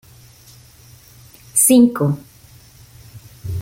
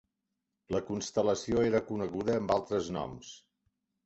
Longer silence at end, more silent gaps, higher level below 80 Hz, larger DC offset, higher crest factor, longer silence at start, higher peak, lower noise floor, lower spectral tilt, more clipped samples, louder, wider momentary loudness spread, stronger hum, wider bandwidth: second, 0 s vs 0.65 s; neither; first, -48 dBFS vs -58 dBFS; neither; about the same, 18 dB vs 18 dB; first, 1.55 s vs 0.7 s; first, -2 dBFS vs -14 dBFS; second, -45 dBFS vs -85 dBFS; about the same, -5 dB/octave vs -5.5 dB/octave; neither; first, -15 LUFS vs -32 LUFS; first, 18 LU vs 10 LU; neither; first, 17 kHz vs 8.2 kHz